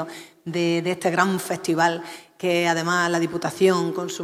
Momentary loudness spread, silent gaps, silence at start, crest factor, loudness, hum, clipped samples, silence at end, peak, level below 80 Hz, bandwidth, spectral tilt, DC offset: 11 LU; none; 0 s; 18 dB; -22 LUFS; none; under 0.1%; 0 s; -4 dBFS; -70 dBFS; 16 kHz; -4.5 dB/octave; under 0.1%